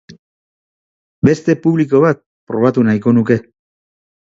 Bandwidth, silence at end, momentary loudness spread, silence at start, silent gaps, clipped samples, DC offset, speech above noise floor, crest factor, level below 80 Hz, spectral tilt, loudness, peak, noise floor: 7.8 kHz; 0.95 s; 5 LU; 0.1 s; 0.19-1.22 s, 2.26-2.47 s; under 0.1%; under 0.1%; over 77 dB; 16 dB; -52 dBFS; -8.5 dB/octave; -14 LUFS; 0 dBFS; under -90 dBFS